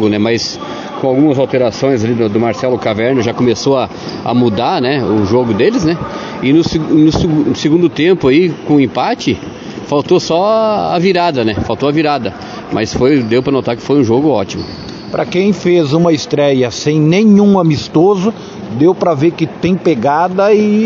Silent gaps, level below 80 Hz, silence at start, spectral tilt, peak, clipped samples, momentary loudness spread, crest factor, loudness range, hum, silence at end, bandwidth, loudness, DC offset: none; -42 dBFS; 0 s; -6.5 dB/octave; 0 dBFS; under 0.1%; 9 LU; 12 dB; 2 LU; none; 0 s; 7.6 kHz; -12 LUFS; under 0.1%